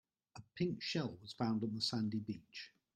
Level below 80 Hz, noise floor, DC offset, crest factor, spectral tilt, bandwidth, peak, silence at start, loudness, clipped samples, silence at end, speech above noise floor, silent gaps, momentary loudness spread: -76 dBFS; -60 dBFS; under 0.1%; 18 dB; -5.5 dB/octave; 10 kHz; -24 dBFS; 0.35 s; -40 LUFS; under 0.1%; 0.25 s; 20 dB; none; 16 LU